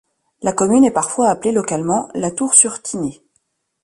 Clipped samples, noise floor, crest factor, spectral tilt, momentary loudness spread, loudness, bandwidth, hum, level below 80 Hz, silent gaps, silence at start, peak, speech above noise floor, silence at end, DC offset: under 0.1%; -67 dBFS; 18 dB; -4.5 dB/octave; 13 LU; -16 LUFS; 11.5 kHz; none; -56 dBFS; none; 0.4 s; 0 dBFS; 51 dB; 0.7 s; under 0.1%